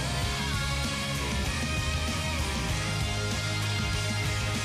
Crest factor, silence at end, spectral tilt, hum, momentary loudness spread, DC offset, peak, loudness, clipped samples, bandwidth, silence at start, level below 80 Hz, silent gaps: 12 dB; 0 s; -4 dB/octave; none; 1 LU; under 0.1%; -18 dBFS; -29 LUFS; under 0.1%; 15.5 kHz; 0 s; -36 dBFS; none